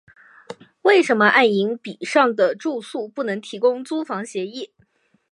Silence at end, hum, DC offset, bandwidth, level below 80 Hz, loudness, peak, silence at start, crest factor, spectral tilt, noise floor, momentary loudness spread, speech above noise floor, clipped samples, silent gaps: 0.65 s; none; under 0.1%; 11.5 kHz; -76 dBFS; -20 LUFS; -2 dBFS; 0.5 s; 20 dB; -4.5 dB/octave; -62 dBFS; 19 LU; 42 dB; under 0.1%; none